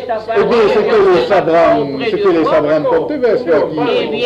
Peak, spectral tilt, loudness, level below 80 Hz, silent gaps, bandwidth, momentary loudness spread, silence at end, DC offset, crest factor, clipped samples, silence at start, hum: -2 dBFS; -6.5 dB/octave; -12 LUFS; -46 dBFS; none; 8.6 kHz; 5 LU; 0 s; under 0.1%; 10 dB; under 0.1%; 0 s; none